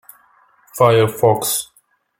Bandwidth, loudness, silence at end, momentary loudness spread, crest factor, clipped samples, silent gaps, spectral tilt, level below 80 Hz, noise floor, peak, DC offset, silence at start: 17 kHz; -16 LUFS; 0.55 s; 19 LU; 16 dB; under 0.1%; none; -4.5 dB/octave; -54 dBFS; -54 dBFS; -2 dBFS; under 0.1%; 0.75 s